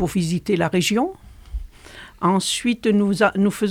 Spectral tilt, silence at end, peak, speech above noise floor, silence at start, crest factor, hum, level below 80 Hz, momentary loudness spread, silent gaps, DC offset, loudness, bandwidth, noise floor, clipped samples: -5 dB/octave; 0 s; -4 dBFS; 23 dB; 0 s; 18 dB; none; -40 dBFS; 18 LU; none; under 0.1%; -20 LUFS; 15.5 kHz; -42 dBFS; under 0.1%